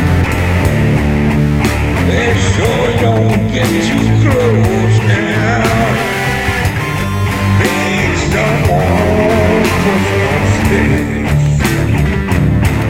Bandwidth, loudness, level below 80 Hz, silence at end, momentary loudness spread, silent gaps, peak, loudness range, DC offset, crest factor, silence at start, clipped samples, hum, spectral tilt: 16.5 kHz; -12 LUFS; -22 dBFS; 0 s; 3 LU; none; 0 dBFS; 1 LU; under 0.1%; 10 dB; 0 s; under 0.1%; none; -6 dB/octave